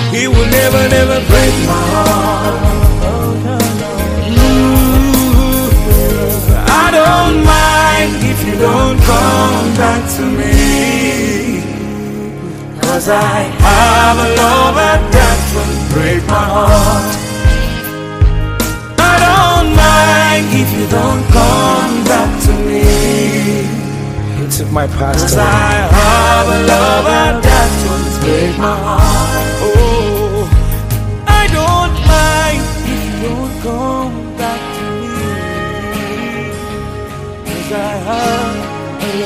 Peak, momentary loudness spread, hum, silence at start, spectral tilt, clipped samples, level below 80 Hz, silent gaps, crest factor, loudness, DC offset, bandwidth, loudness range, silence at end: 0 dBFS; 11 LU; none; 0 s; -5 dB/octave; 0.5%; -16 dBFS; none; 10 dB; -11 LUFS; under 0.1%; 16 kHz; 8 LU; 0 s